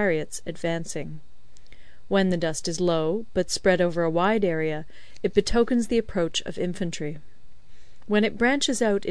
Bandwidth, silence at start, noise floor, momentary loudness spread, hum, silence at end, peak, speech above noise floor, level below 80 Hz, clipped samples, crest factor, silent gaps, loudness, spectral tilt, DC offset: 11 kHz; 0 s; -50 dBFS; 12 LU; none; 0 s; -6 dBFS; 26 dB; -44 dBFS; under 0.1%; 20 dB; none; -25 LUFS; -4.5 dB/octave; 2%